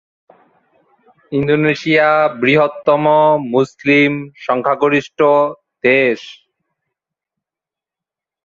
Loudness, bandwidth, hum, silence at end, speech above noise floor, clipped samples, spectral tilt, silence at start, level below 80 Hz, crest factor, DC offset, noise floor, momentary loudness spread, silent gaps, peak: -14 LUFS; 7.4 kHz; none; 2.1 s; 73 dB; under 0.1%; -6.5 dB/octave; 1.3 s; -58 dBFS; 16 dB; under 0.1%; -87 dBFS; 8 LU; none; 0 dBFS